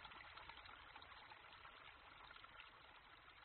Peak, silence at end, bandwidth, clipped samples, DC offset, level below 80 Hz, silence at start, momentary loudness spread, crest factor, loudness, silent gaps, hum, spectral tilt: -42 dBFS; 0 s; 4.3 kHz; under 0.1%; under 0.1%; -76 dBFS; 0 s; 6 LU; 20 dB; -60 LUFS; none; none; 0 dB/octave